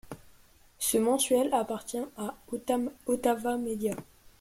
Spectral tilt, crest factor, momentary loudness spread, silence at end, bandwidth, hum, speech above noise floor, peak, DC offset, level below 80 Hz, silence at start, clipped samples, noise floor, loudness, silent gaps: -3.5 dB/octave; 18 dB; 13 LU; 0.4 s; 16.5 kHz; none; 29 dB; -12 dBFS; under 0.1%; -62 dBFS; 0.05 s; under 0.1%; -59 dBFS; -30 LUFS; none